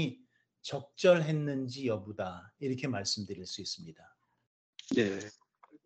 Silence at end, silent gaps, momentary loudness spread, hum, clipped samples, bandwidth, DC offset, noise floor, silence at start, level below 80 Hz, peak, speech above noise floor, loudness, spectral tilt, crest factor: 0.1 s; 4.47-4.73 s; 18 LU; none; under 0.1%; 9 kHz; under 0.1%; -65 dBFS; 0 s; -76 dBFS; -12 dBFS; 32 dB; -33 LUFS; -5 dB/octave; 24 dB